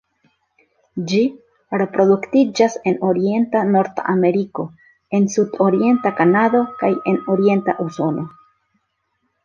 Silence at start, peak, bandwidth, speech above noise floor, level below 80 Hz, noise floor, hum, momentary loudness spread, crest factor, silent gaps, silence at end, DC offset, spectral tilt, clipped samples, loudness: 0.95 s; -2 dBFS; 7.4 kHz; 53 dB; -64 dBFS; -70 dBFS; none; 10 LU; 16 dB; none; 1.15 s; under 0.1%; -6.5 dB/octave; under 0.1%; -18 LUFS